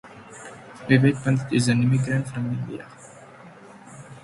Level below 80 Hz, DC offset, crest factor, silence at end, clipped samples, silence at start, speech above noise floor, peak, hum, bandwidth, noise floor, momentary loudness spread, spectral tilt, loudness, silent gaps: -58 dBFS; under 0.1%; 20 dB; 0.05 s; under 0.1%; 0.05 s; 24 dB; -4 dBFS; none; 11.5 kHz; -46 dBFS; 25 LU; -6.5 dB/octave; -22 LUFS; none